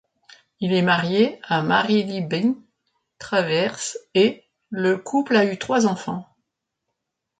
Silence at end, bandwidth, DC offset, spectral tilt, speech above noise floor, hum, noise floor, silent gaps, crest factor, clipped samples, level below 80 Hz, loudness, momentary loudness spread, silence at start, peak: 1.15 s; 9.4 kHz; under 0.1%; -5 dB/octave; 59 dB; none; -80 dBFS; none; 18 dB; under 0.1%; -66 dBFS; -21 LUFS; 11 LU; 0.6 s; -6 dBFS